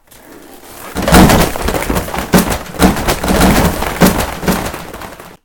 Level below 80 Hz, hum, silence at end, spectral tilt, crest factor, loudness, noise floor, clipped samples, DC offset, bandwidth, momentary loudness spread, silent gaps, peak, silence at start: -22 dBFS; none; 0.1 s; -4.5 dB/octave; 12 dB; -12 LUFS; -37 dBFS; 0.8%; under 0.1%; over 20 kHz; 17 LU; none; 0 dBFS; 0.3 s